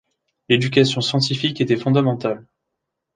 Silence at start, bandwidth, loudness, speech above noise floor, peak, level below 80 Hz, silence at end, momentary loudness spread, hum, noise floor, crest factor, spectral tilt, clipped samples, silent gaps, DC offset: 0.5 s; 9.6 kHz; -19 LUFS; 61 dB; -2 dBFS; -60 dBFS; 0.75 s; 8 LU; none; -79 dBFS; 18 dB; -5.5 dB/octave; under 0.1%; none; under 0.1%